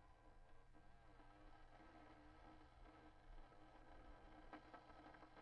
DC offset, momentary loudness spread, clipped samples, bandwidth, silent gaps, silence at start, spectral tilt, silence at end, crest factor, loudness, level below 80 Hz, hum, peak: under 0.1%; 5 LU; under 0.1%; 6.6 kHz; none; 0 s; -4.5 dB/octave; 0 s; 16 dB; -66 LUFS; -68 dBFS; none; -48 dBFS